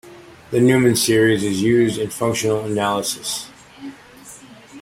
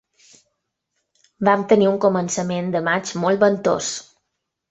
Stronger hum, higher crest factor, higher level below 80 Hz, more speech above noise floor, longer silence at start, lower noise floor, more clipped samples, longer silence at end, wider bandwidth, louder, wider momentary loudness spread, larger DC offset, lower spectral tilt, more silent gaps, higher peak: neither; about the same, 16 dB vs 20 dB; first, -54 dBFS vs -62 dBFS; second, 25 dB vs 59 dB; second, 0.05 s vs 1.4 s; second, -42 dBFS vs -78 dBFS; neither; second, 0 s vs 0.7 s; first, 16.5 kHz vs 8.4 kHz; about the same, -18 LUFS vs -19 LUFS; first, 22 LU vs 7 LU; neither; about the same, -4.5 dB/octave vs -5 dB/octave; neither; about the same, -2 dBFS vs -2 dBFS